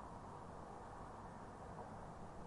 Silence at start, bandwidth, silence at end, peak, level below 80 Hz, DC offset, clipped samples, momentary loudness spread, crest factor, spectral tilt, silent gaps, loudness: 0 s; 11 kHz; 0 s; -40 dBFS; -64 dBFS; under 0.1%; under 0.1%; 1 LU; 14 dB; -6.5 dB/octave; none; -54 LUFS